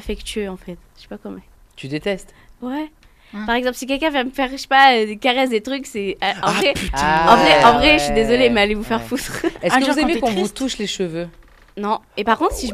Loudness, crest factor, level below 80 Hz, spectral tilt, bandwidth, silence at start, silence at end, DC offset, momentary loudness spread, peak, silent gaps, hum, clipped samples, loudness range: -17 LUFS; 18 dB; -38 dBFS; -4 dB/octave; 14.5 kHz; 0 s; 0 s; under 0.1%; 19 LU; 0 dBFS; none; none; under 0.1%; 11 LU